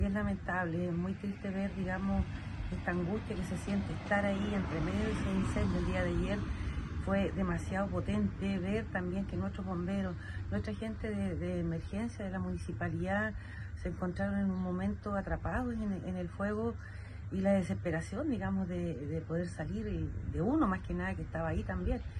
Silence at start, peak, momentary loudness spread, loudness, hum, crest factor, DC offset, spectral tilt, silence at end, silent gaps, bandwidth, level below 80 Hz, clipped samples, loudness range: 0 s; -18 dBFS; 6 LU; -36 LUFS; none; 18 dB; under 0.1%; -7.5 dB/octave; 0 s; none; 11.5 kHz; -44 dBFS; under 0.1%; 3 LU